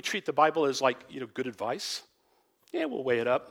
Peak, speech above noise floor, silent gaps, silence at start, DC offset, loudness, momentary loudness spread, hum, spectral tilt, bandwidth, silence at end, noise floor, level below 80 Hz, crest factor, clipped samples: -8 dBFS; 40 dB; none; 0.05 s; under 0.1%; -30 LUFS; 13 LU; none; -3.5 dB/octave; 16.5 kHz; 0 s; -70 dBFS; -78 dBFS; 22 dB; under 0.1%